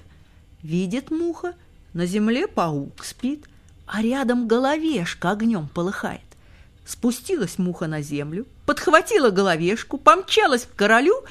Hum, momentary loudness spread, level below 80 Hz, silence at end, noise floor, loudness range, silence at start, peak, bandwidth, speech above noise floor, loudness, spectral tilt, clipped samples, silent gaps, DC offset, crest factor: none; 13 LU; -52 dBFS; 0 s; -50 dBFS; 7 LU; 0.65 s; 0 dBFS; 15 kHz; 29 dB; -21 LUFS; -5 dB/octave; under 0.1%; none; under 0.1%; 22 dB